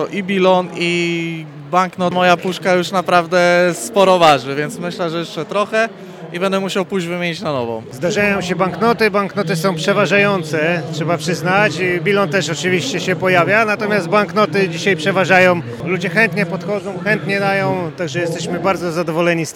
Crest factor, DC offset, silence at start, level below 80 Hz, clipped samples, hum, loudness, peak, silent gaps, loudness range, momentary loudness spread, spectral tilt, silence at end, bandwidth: 16 dB; under 0.1%; 0 s; -58 dBFS; under 0.1%; none; -16 LUFS; 0 dBFS; none; 4 LU; 9 LU; -5 dB/octave; 0.05 s; 17 kHz